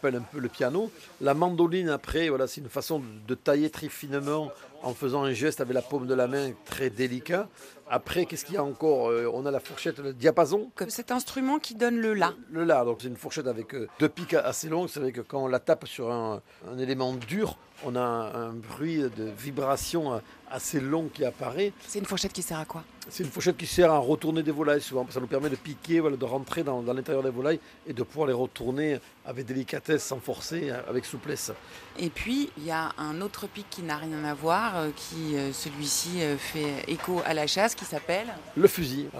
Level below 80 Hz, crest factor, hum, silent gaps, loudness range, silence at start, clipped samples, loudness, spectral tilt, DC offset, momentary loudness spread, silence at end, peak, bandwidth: -58 dBFS; 24 dB; none; none; 5 LU; 0 s; under 0.1%; -29 LUFS; -4.5 dB/octave; under 0.1%; 10 LU; 0 s; -4 dBFS; 15.5 kHz